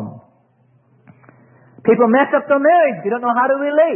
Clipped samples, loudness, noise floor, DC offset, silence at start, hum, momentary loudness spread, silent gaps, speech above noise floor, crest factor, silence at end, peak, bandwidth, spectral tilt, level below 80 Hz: under 0.1%; -15 LUFS; -56 dBFS; under 0.1%; 0 s; none; 7 LU; none; 42 dB; 16 dB; 0 s; -2 dBFS; 3.4 kHz; -11.5 dB/octave; -70 dBFS